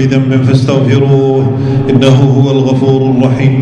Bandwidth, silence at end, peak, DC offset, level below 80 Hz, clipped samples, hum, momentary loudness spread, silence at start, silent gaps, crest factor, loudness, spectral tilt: 8 kHz; 0 s; 0 dBFS; under 0.1%; -38 dBFS; 2%; none; 3 LU; 0 s; none; 8 dB; -9 LUFS; -8 dB/octave